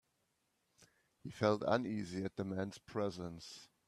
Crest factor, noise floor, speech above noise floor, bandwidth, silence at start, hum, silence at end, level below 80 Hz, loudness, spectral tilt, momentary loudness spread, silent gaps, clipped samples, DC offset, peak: 24 dB; -82 dBFS; 43 dB; 13 kHz; 1.25 s; none; 0.2 s; -74 dBFS; -39 LUFS; -6 dB/octave; 17 LU; none; under 0.1%; under 0.1%; -18 dBFS